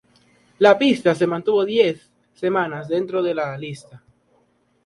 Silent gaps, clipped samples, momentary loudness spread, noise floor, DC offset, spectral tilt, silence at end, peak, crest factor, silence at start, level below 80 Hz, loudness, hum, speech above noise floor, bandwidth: none; under 0.1%; 15 LU; -63 dBFS; under 0.1%; -6 dB/octave; 0.9 s; 0 dBFS; 20 dB; 0.6 s; -66 dBFS; -19 LUFS; none; 44 dB; 11.5 kHz